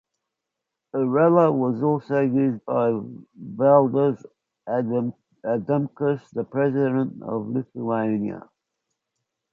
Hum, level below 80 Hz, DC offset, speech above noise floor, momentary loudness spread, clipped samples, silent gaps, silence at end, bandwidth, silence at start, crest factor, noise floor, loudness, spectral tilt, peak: none; -68 dBFS; under 0.1%; 62 dB; 14 LU; under 0.1%; none; 1.1 s; 4.5 kHz; 0.95 s; 20 dB; -84 dBFS; -23 LUFS; -10.5 dB/octave; -4 dBFS